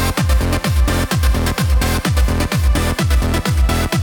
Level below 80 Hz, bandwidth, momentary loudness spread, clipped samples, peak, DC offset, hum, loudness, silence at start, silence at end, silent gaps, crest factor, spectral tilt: -18 dBFS; 20 kHz; 1 LU; under 0.1%; -4 dBFS; under 0.1%; none; -17 LUFS; 0 s; 0 s; none; 10 dB; -5 dB/octave